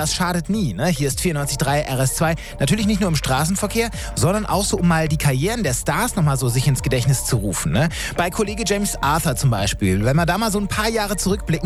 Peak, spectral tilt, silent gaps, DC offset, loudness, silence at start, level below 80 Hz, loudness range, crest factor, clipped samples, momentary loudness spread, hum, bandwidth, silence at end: -6 dBFS; -4.5 dB/octave; none; under 0.1%; -20 LUFS; 0 s; -32 dBFS; 1 LU; 12 dB; under 0.1%; 3 LU; none; 16 kHz; 0 s